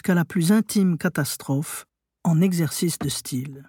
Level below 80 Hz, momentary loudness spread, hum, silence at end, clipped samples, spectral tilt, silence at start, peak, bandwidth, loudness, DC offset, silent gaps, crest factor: -60 dBFS; 9 LU; none; 0.05 s; under 0.1%; -5.5 dB/octave; 0.05 s; -8 dBFS; 18 kHz; -23 LUFS; under 0.1%; none; 14 dB